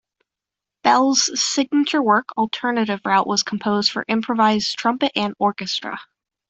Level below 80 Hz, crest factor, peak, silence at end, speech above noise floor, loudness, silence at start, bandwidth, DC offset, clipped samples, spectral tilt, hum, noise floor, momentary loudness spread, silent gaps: -64 dBFS; 18 dB; -2 dBFS; 0.45 s; 67 dB; -19 LUFS; 0.85 s; 8.4 kHz; under 0.1%; under 0.1%; -3 dB/octave; none; -86 dBFS; 7 LU; none